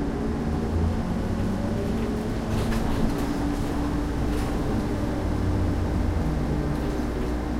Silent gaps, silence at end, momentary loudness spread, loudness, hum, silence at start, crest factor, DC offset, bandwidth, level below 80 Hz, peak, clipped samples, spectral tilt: none; 0 s; 2 LU; -27 LUFS; none; 0 s; 14 dB; under 0.1%; 16 kHz; -30 dBFS; -10 dBFS; under 0.1%; -7.5 dB/octave